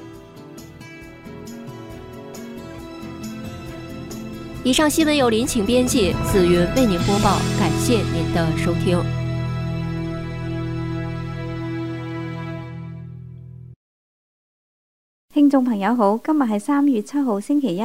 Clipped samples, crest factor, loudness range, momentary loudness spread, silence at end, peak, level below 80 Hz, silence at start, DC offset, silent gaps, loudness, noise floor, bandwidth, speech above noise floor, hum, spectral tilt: under 0.1%; 18 dB; 17 LU; 20 LU; 0 s; -4 dBFS; -40 dBFS; 0 s; under 0.1%; 13.76-15.28 s; -20 LUFS; under -90 dBFS; 16 kHz; over 72 dB; none; -5.5 dB/octave